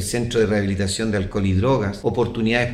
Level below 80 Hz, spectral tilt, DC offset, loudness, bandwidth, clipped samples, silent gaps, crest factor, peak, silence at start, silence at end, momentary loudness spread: -40 dBFS; -5.5 dB/octave; under 0.1%; -21 LUFS; 15 kHz; under 0.1%; none; 16 dB; -4 dBFS; 0 s; 0 s; 3 LU